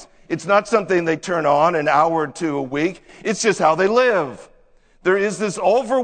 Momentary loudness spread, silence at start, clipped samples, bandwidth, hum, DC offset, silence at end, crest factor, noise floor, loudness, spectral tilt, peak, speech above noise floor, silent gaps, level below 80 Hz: 8 LU; 0 s; under 0.1%; 9.4 kHz; none; under 0.1%; 0 s; 18 dB; -53 dBFS; -19 LUFS; -4.5 dB/octave; -2 dBFS; 35 dB; none; -56 dBFS